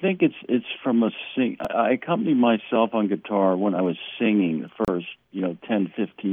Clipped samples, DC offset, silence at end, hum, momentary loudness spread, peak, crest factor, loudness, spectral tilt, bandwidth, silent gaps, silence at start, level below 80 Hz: under 0.1%; under 0.1%; 0 s; none; 7 LU; -6 dBFS; 18 dB; -24 LUFS; -8.5 dB/octave; 3.9 kHz; none; 0 s; -60 dBFS